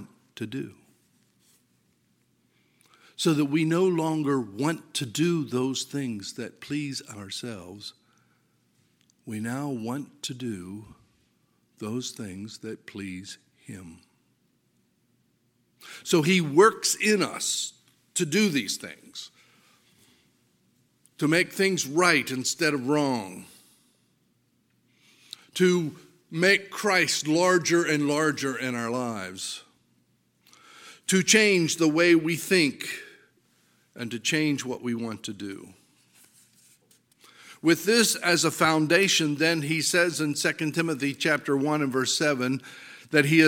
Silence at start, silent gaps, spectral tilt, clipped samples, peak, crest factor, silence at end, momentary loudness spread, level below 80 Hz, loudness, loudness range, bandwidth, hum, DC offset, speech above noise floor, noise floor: 0 s; none; -3.5 dB/octave; under 0.1%; -4 dBFS; 24 dB; 0 s; 18 LU; -74 dBFS; -25 LUFS; 14 LU; 17 kHz; none; under 0.1%; 44 dB; -69 dBFS